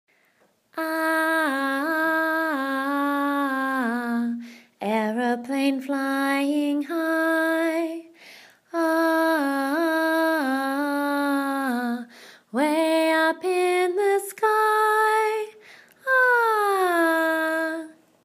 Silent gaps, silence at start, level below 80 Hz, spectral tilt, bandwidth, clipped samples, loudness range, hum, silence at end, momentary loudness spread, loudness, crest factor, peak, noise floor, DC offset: none; 0.75 s; -88 dBFS; -3.5 dB/octave; 15.5 kHz; under 0.1%; 4 LU; none; 0.3 s; 10 LU; -23 LUFS; 16 dB; -8 dBFS; -64 dBFS; under 0.1%